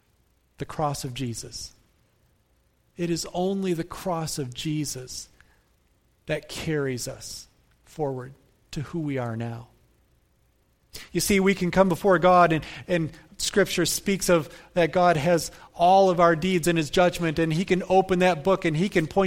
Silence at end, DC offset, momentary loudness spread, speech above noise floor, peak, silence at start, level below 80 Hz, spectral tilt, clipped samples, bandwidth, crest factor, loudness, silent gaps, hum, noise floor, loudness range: 0 s; under 0.1%; 17 LU; 42 dB; -4 dBFS; 0.6 s; -50 dBFS; -5 dB/octave; under 0.1%; 16.5 kHz; 20 dB; -24 LUFS; none; none; -66 dBFS; 12 LU